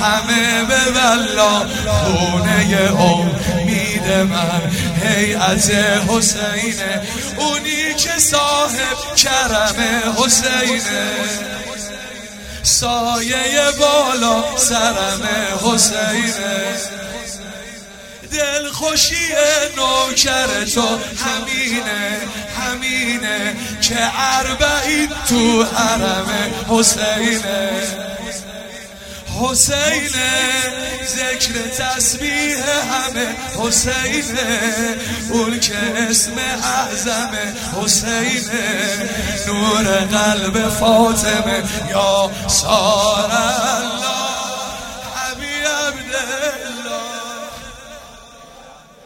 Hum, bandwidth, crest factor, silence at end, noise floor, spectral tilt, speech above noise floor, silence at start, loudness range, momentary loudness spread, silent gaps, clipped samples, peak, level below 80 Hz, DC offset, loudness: none; 16.5 kHz; 18 dB; 0.3 s; -41 dBFS; -2.5 dB/octave; 25 dB; 0 s; 4 LU; 12 LU; none; under 0.1%; 0 dBFS; -38 dBFS; under 0.1%; -16 LUFS